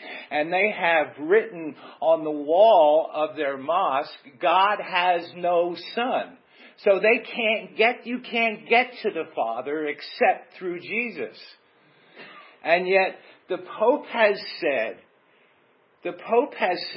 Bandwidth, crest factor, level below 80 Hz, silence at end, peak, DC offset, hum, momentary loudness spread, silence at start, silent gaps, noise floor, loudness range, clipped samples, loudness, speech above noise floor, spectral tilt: 5.8 kHz; 20 dB; -90 dBFS; 0 s; -4 dBFS; under 0.1%; none; 13 LU; 0 s; none; -62 dBFS; 6 LU; under 0.1%; -23 LUFS; 38 dB; -8.5 dB/octave